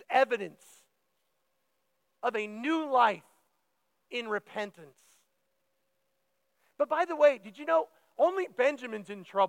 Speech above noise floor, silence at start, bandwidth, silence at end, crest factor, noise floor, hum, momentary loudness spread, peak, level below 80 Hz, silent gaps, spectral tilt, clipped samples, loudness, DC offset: 50 dB; 0.1 s; 12 kHz; 0 s; 20 dB; -79 dBFS; none; 14 LU; -12 dBFS; under -90 dBFS; none; -4.5 dB/octave; under 0.1%; -30 LUFS; under 0.1%